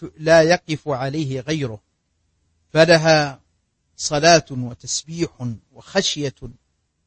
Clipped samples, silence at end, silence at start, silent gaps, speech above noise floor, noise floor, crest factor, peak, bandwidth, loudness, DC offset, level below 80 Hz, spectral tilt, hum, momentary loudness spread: under 0.1%; 0.55 s; 0 s; none; 50 dB; -68 dBFS; 20 dB; -2 dBFS; 8.8 kHz; -19 LUFS; under 0.1%; -52 dBFS; -4 dB/octave; none; 15 LU